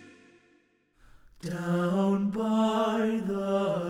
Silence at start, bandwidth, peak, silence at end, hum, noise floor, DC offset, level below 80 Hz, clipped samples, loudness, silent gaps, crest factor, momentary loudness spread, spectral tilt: 0 s; 13 kHz; -16 dBFS; 0 s; none; -66 dBFS; under 0.1%; -62 dBFS; under 0.1%; -28 LUFS; none; 14 dB; 8 LU; -7 dB/octave